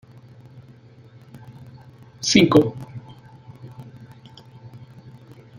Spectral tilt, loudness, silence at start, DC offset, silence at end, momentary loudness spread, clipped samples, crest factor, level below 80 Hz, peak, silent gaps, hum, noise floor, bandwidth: -4.5 dB/octave; -17 LUFS; 1.35 s; under 0.1%; 0.8 s; 29 LU; under 0.1%; 24 dB; -56 dBFS; 0 dBFS; none; none; -47 dBFS; 15.5 kHz